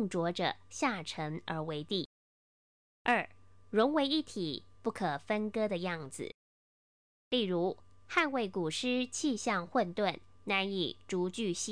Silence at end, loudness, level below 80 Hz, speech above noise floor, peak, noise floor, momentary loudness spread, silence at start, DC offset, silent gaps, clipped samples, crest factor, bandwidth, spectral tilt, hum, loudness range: 0 s; -34 LUFS; -70 dBFS; over 56 dB; -14 dBFS; under -90 dBFS; 8 LU; 0 s; 0.1%; 2.06-3.05 s, 6.34-7.31 s; under 0.1%; 20 dB; 10.5 kHz; -4 dB/octave; none; 4 LU